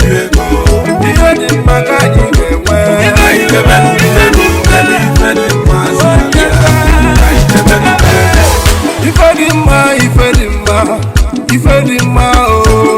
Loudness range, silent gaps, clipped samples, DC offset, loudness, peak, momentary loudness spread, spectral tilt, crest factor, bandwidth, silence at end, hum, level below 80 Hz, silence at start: 1 LU; none; 2%; under 0.1%; -8 LUFS; 0 dBFS; 4 LU; -5 dB/octave; 6 dB; 16.5 kHz; 0 s; none; -12 dBFS; 0 s